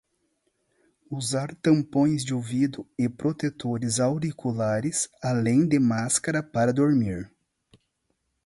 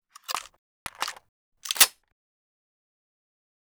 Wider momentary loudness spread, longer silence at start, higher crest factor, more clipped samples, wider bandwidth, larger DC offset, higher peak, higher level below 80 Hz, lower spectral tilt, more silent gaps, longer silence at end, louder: second, 8 LU vs 22 LU; first, 1.1 s vs 0.3 s; second, 18 dB vs 30 dB; neither; second, 11.5 kHz vs over 20 kHz; neither; second, -8 dBFS vs -2 dBFS; first, -58 dBFS vs -68 dBFS; first, -5.5 dB/octave vs 2.5 dB/octave; second, none vs 0.58-0.86 s, 1.29-1.52 s; second, 1.2 s vs 1.8 s; about the same, -25 LUFS vs -24 LUFS